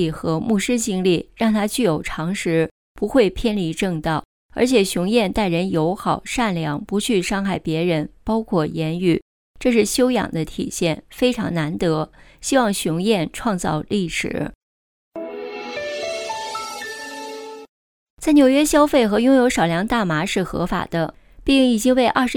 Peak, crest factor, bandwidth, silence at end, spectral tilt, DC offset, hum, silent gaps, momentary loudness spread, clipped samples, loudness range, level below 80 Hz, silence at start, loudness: -2 dBFS; 16 dB; 19 kHz; 0 s; -5 dB/octave; under 0.1%; none; 2.71-2.95 s, 4.25-4.49 s, 9.22-9.54 s, 14.55-15.11 s, 17.69-18.17 s; 13 LU; under 0.1%; 8 LU; -42 dBFS; 0 s; -20 LUFS